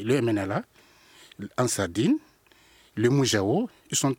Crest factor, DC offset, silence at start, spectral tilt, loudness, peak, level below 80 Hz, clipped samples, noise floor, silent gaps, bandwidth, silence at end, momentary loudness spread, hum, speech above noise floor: 18 dB; under 0.1%; 0 s; -4.5 dB/octave; -26 LUFS; -8 dBFS; -68 dBFS; under 0.1%; -58 dBFS; none; 17 kHz; 0.05 s; 11 LU; none; 33 dB